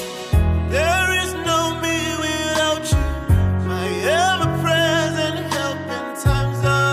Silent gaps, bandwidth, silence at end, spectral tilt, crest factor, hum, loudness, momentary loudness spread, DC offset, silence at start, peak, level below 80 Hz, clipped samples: none; 15.5 kHz; 0 s; -4.5 dB/octave; 14 dB; none; -19 LUFS; 5 LU; under 0.1%; 0 s; -4 dBFS; -28 dBFS; under 0.1%